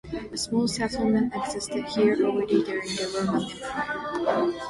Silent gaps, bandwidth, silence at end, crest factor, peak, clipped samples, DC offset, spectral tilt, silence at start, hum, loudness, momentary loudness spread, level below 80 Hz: none; 11.5 kHz; 0 s; 16 dB; -10 dBFS; under 0.1%; under 0.1%; -4.5 dB/octave; 0.05 s; none; -26 LUFS; 7 LU; -54 dBFS